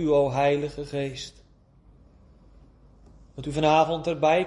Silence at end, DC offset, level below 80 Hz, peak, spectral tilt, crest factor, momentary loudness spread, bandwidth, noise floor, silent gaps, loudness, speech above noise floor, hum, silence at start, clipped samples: 0 s; under 0.1%; -52 dBFS; -6 dBFS; -6 dB/octave; 20 dB; 17 LU; 11 kHz; -56 dBFS; none; -24 LUFS; 32 dB; none; 0 s; under 0.1%